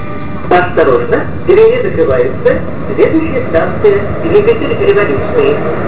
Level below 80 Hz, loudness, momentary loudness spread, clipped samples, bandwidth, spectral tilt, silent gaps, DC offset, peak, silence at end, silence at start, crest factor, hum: -30 dBFS; -11 LUFS; 6 LU; 0.5%; 4 kHz; -11 dB/octave; none; 10%; 0 dBFS; 0 s; 0 s; 12 dB; none